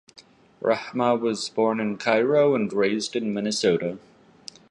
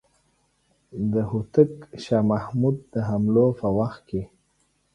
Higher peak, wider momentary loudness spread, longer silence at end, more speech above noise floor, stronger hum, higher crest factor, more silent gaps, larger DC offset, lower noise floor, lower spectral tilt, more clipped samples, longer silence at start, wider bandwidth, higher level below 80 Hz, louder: about the same, -6 dBFS vs -4 dBFS; about the same, 13 LU vs 12 LU; about the same, 0.75 s vs 0.7 s; second, 24 dB vs 45 dB; neither; about the same, 18 dB vs 20 dB; neither; neither; second, -47 dBFS vs -68 dBFS; second, -4.5 dB/octave vs -9.5 dB/octave; neither; second, 0.15 s vs 0.95 s; first, 11.5 kHz vs 9.6 kHz; second, -68 dBFS vs -52 dBFS; about the same, -23 LUFS vs -24 LUFS